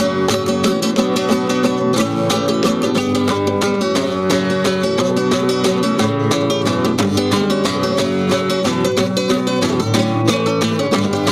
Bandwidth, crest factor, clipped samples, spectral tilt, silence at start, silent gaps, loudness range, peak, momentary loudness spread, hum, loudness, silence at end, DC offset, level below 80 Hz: 16 kHz; 14 dB; under 0.1%; -5 dB/octave; 0 s; none; 0 LU; -2 dBFS; 1 LU; none; -16 LUFS; 0 s; under 0.1%; -50 dBFS